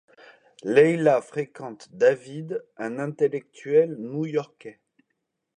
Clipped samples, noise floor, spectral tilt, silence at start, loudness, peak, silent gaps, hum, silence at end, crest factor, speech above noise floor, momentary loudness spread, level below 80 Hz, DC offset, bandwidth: under 0.1%; -79 dBFS; -7 dB/octave; 0.65 s; -24 LUFS; -4 dBFS; none; none; 0.85 s; 20 dB; 55 dB; 19 LU; -78 dBFS; under 0.1%; 9.8 kHz